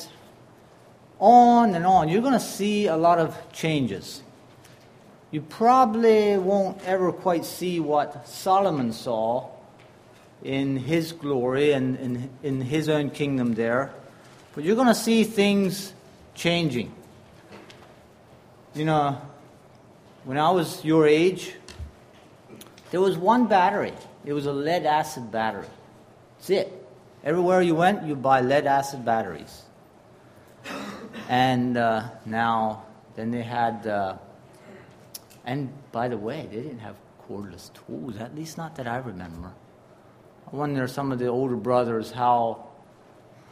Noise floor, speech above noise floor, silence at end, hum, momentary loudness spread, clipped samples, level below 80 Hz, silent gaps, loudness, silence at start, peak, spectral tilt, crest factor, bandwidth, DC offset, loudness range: -52 dBFS; 29 dB; 0.8 s; none; 20 LU; under 0.1%; -60 dBFS; none; -23 LUFS; 0 s; -2 dBFS; -6 dB/octave; 22 dB; 15.5 kHz; under 0.1%; 11 LU